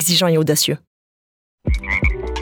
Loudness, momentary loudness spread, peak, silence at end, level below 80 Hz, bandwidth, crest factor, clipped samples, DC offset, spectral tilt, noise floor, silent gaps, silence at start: -18 LUFS; 12 LU; -2 dBFS; 0 s; -26 dBFS; over 20 kHz; 18 dB; under 0.1%; under 0.1%; -3.5 dB/octave; under -90 dBFS; 0.87-1.58 s; 0 s